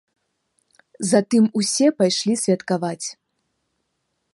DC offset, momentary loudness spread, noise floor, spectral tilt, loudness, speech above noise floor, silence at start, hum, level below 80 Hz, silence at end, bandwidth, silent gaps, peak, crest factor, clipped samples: under 0.1%; 10 LU; -74 dBFS; -4.5 dB/octave; -20 LUFS; 55 dB; 1 s; none; -72 dBFS; 1.2 s; 11.5 kHz; none; -4 dBFS; 18 dB; under 0.1%